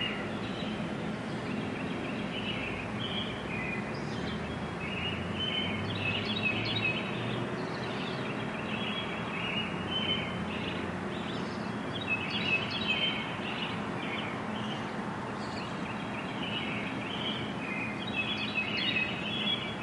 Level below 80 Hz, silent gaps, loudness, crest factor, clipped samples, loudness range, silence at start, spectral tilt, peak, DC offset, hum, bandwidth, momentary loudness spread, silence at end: -58 dBFS; none; -33 LUFS; 16 dB; under 0.1%; 3 LU; 0 s; -5 dB/octave; -18 dBFS; under 0.1%; none; 11.5 kHz; 7 LU; 0 s